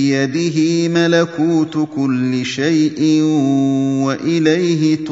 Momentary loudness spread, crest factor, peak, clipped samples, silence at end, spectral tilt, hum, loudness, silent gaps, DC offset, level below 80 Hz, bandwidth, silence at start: 4 LU; 14 dB; 0 dBFS; under 0.1%; 0 s; -6 dB/octave; none; -15 LUFS; none; under 0.1%; -62 dBFS; 7.8 kHz; 0 s